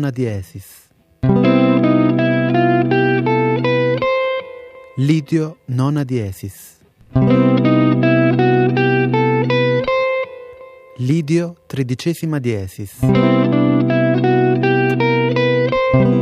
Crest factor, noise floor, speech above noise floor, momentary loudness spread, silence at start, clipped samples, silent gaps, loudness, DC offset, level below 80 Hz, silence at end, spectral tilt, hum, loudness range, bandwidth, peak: 14 dB; -39 dBFS; 22 dB; 11 LU; 0 s; under 0.1%; none; -16 LUFS; under 0.1%; -46 dBFS; 0 s; -7.5 dB/octave; none; 5 LU; 14 kHz; -2 dBFS